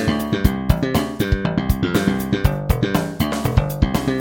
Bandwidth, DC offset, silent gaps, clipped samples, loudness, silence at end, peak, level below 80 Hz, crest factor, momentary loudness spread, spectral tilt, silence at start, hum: 17 kHz; under 0.1%; none; under 0.1%; -20 LUFS; 0 s; 0 dBFS; -26 dBFS; 18 dB; 2 LU; -6.5 dB/octave; 0 s; none